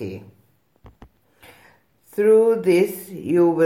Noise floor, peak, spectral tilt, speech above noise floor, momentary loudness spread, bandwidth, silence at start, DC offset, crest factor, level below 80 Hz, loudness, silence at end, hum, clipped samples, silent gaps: -56 dBFS; -8 dBFS; -7 dB/octave; 38 dB; 18 LU; 16.5 kHz; 0 s; under 0.1%; 14 dB; -60 dBFS; -18 LUFS; 0 s; none; under 0.1%; none